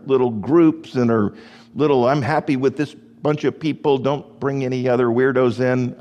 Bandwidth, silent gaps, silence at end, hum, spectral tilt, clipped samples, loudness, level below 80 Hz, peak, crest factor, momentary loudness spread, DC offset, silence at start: 9.6 kHz; none; 0.05 s; none; -8 dB/octave; under 0.1%; -19 LUFS; -60 dBFS; -4 dBFS; 16 dB; 8 LU; under 0.1%; 0.05 s